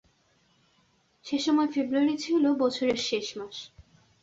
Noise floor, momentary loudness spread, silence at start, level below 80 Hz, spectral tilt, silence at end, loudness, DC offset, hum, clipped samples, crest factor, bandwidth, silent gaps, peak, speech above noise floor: -67 dBFS; 16 LU; 1.25 s; -68 dBFS; -3.5 dB/octave; 0.4 s; -27 LUFS; under 0.1%; none; under 0.1%; 16 dB; 7.8 kHz; none; -12 dBFS; 41 dB